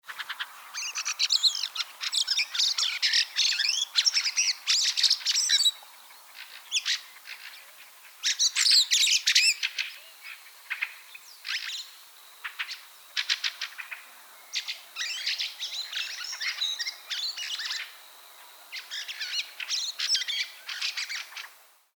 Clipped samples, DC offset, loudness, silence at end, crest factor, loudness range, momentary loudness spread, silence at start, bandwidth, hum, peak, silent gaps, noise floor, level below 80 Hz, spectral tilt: under 0.1%; under 0.1%; -26 LUFS; 0.45 s; 22 dB; 10 LU; 21 LU; 0.05 s; over 20 kHz; none; -8 dBFS; none; -52 dBFS; under -90 dBFS; 7.5 dB/octave